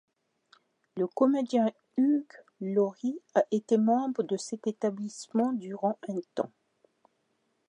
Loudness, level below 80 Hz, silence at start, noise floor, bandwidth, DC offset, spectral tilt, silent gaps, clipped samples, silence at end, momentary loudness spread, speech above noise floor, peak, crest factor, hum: -30 LUFS; -86 dBFS; 0.95 s; -75 dBFS; 10.5 kHz; under 0.1%; -6.5 dB/octave; none; under 0.1%; 1.2 s; 10 LU; 47 dB; -12 dBFS; 18 dB; none